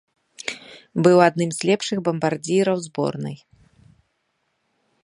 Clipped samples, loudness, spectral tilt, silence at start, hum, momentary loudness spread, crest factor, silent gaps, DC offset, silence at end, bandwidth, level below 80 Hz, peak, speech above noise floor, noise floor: under 0.1%; -21 LUFS; -5.5 dB/octave; 0.4 s; none; 17 LU; 22 dB; none; under 0.1%; 1.65 s; 11.5 kHz; -66 dBFS; -2 dBFS; 52 dB; -72 dBFS